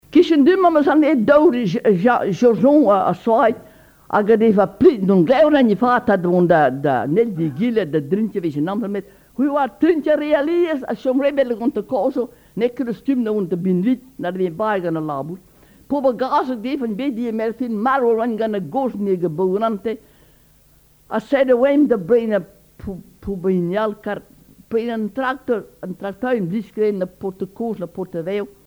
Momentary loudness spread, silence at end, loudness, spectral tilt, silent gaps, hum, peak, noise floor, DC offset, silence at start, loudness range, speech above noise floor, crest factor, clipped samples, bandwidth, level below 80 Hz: 13 LU; 0.15 s; -18 LUFS; -8 dB/octave; none; none; -2 dBFS; -53 dBFS; under 0.1%; 0.1 s; 8 LU; 35 dB; 16 dB; under 0.1%; over 20 kHz; -52 dBFS